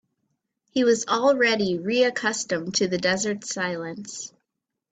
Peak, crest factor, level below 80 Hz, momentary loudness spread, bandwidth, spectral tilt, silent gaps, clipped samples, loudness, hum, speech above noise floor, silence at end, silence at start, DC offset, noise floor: -8 dBFS; 18 dB; -66 dBFS; 14 LU; 9.2 kHz; -3.5 dB/octave; none; under 0.1%; -23 LUFS; none; 60 dB; 0.65 s; 0.75 s; under 0.1%; -83 dBFS